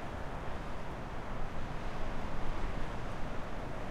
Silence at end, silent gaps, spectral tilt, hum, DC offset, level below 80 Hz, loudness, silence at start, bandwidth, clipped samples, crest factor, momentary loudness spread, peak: 0 s; none; -6 dB/octave; none; under 0.1%; -40 dBFS; -42 LUFS; 0 s; 8.2 kHz; under 0.1%; 14 dB; 2 LU; -22 dBFS